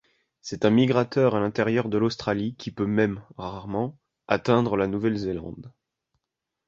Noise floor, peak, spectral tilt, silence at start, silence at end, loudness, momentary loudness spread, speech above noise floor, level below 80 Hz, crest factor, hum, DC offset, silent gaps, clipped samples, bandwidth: -84 dBFS; -4 dBFS; -7 dB/octave; 0.45 s; 1 s; -25 LUFS; 14 LU; 60 dB; -54 dBFS; 22 dB; none; under 0.1%; none; under 0.1%; 7.6 kHz